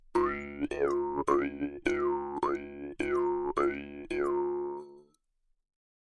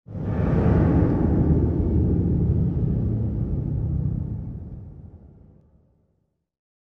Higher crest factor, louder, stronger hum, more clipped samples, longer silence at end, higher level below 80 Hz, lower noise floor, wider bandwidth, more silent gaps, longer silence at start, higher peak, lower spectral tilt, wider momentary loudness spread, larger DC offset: about the same, 18 dB vs 16 dB; second, -32 LUFS vs -23 LUFS; neither; neither; second, 1 s vs 1.55 s; second, -56 dBFS vs -30 dBFS; about the same, -74 dBFS vs -71 dBFS; first, 10.5 kHz vs 3.4 kHz; neither; about the same, 0.15 s vs 0.1 s; second, -14 dBFS vs -8 dBFS; second, -6 dB/octave vs -12 dB/octave; second, 8 LU vs 14 LU; neither